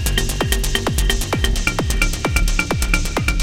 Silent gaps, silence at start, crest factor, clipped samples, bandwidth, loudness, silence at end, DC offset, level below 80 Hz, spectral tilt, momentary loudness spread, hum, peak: none; 0 s; 18 dB; under 0.1%; 17 kHz; -19 LUFS; 0 s; under 0.1%; -20 dBFS; -3.5 dB/octave; 1 LU; none; 0 dBFS